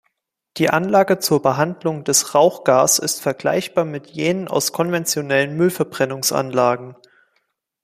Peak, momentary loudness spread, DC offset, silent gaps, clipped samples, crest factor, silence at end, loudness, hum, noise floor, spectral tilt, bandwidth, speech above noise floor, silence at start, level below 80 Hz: -2 dBFS; 7 LU; under 0.1%; none; under 0.1%; 18 dB; 0.9 s; -18 LUFS; none; -71 dBFS; -3.5 dB/octave; 15.5 kHz; 53 dB; 0.55 s; -62 dBFS